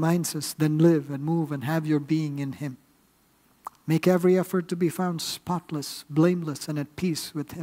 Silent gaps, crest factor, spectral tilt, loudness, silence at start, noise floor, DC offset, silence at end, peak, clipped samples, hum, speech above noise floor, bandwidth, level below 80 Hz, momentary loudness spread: none; 18 dB; -6 dB/octave; -26 LUFS; 0 s; -63 dBFS; under 0.1%; 0 s; -8 dBFS; under 0.1%; none; 38 dB; 16 kHz; -66 dBFS; 12 LU